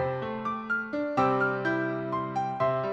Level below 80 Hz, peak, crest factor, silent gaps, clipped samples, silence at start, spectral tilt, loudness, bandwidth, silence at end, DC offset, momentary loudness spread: -62 dBFS; -12 dBFS; 16 dB; none; under 0.1%; 0 s; -7.5 dB/octave; -29 LUFS; 8 kHz; 0 s; under 0.1%; 6 LU